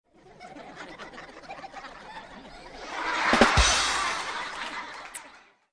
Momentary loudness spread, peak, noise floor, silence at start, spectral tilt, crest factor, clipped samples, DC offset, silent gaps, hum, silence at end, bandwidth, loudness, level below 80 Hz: 24 LU; -6 dBFS; -53 dBFS; 0.25 s; -2.5 dB/octave; 24 dB; under 0.1%; under 0.1%; none; none; 0.35 s; 11 kHz; -24 LUFS; -40 dBFS